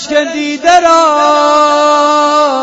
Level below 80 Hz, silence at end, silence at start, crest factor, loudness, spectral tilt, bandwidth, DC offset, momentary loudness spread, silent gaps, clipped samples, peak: -50 dBFS; 0 s; 0 s; 8 dB; -8 LUFS; -1.5 dB/octave; 8.6 kHz; under 0.1%; 6 LU; none; 0.3%; 0 dBFS